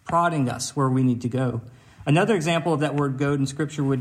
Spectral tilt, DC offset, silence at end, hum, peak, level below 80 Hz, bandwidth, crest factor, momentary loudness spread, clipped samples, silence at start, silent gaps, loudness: -6 dB/octave; under 0.1%; 0 s; none; -8 dBFS; -58 dBFS; 14.5 kHz; 14 dB; 6 LU; under 0.1%; 0.05 s; none; -23 LUFS